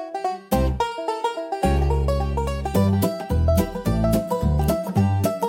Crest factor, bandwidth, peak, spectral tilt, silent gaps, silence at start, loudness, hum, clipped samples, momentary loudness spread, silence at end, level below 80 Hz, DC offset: 14 dB; 17 kHz; -6 dBFS; -7 dB/octave; none; 0 s; -22 LUFS; none; under 0.1%; 5 LU; 0 s; -28 dBFS; under 0.1%